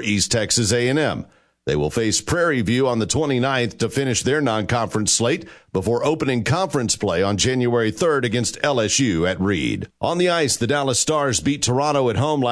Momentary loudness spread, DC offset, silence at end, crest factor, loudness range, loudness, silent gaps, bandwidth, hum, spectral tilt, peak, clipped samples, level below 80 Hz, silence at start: 5 LU; under 0.1%; 0 s; 18 dB; 1 LU; -20 LUFS; none; 11 kHz; none; -4 dB/octave; -2 dBFS; under 0.1%; -46 dBFS; 0 s